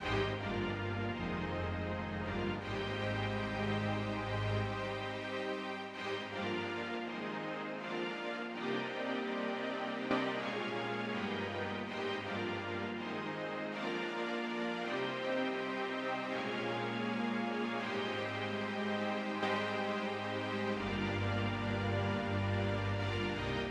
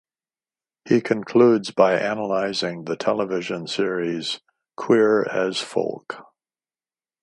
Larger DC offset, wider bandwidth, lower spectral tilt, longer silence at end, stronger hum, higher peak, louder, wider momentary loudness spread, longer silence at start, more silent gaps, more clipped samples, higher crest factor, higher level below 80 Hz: neither; about the same, 10.5 kHz vs 11.5 kHz; about the same, -6 dB/octave vs -5 dB/octave; second, 0 s vs 1 s; neither; second, -20 dBFS vs -2 dBFS; second, -37 LUFS vs -21 LUFS; second, 4 LU vs 12 LU; second, 0 s vs 0.85 s; neither; neither; about the same, 16 dB vs 20 dB; first, -58 dBFS vs -70 dBFS